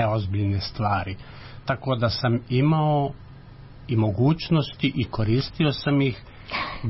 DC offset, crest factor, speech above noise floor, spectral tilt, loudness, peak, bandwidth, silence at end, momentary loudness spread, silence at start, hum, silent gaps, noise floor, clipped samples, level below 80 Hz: under 0.1%; 14 dB; 20 dB; -10 dB/octave; -24 LUFS; -10 dBFS; 5.8 kHz; 0 s; 13 LU; 0 s; none; none; -43 dBFS; under 0.1%; -46 dBFS